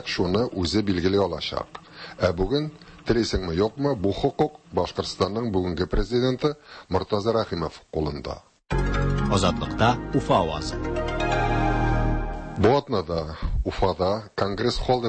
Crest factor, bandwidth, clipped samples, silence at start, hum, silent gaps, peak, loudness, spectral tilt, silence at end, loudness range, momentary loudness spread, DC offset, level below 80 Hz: 18 dB; 8.8 kHz; under 0.1%; 0 s; none; none; -8 dBFS; -25 LUFS; -6 dB/octave; 0 s; 2 LU; 8 LU; under 0.1%; -34 dBFS